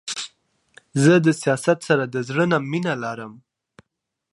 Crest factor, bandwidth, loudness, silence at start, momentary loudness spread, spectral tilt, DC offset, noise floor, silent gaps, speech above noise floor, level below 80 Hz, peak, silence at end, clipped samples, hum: 18 dB; 11.5 kHz; -21 LUFS; 0.05 s; 15 LU; -5.5 dB/octave; under 0.1%; -80 dBFS; none; 60 dB; -66 dBFS; -4 dBFS; 0.95 s; under 0.1%; none